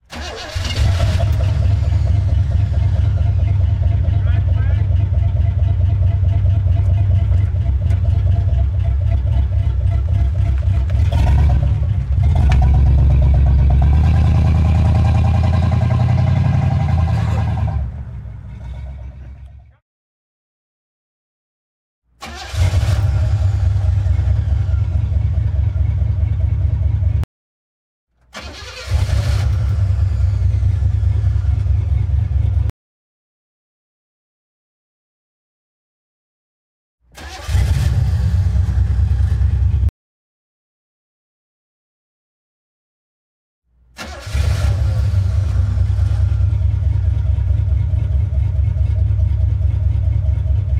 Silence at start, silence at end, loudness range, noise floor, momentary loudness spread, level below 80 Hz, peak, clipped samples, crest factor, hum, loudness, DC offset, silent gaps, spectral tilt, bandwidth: 0.1 s; 0 s; 10 LU; -38 dBFS; 9 LU; -20 dBFS; -4 dBFS; under 0.1%; 12 dB; none; -17 LUFS; under 0.1%; 19.82-22.02 s, 27.24-28.07 s, 32.70-36.98 s, 39.89-43.62 s; -7.5 dB/octave; 9 kHz